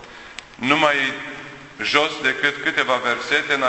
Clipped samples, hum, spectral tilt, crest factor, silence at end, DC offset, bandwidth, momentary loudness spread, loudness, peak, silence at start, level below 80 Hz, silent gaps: under 0.1%; none; -3 dB/octave; 22 dB; 0 s; under 0.1%; 8.4 kHz; 19 LU; -19 LUFS; 0 dBFS; 0 s; -58 dBFS; none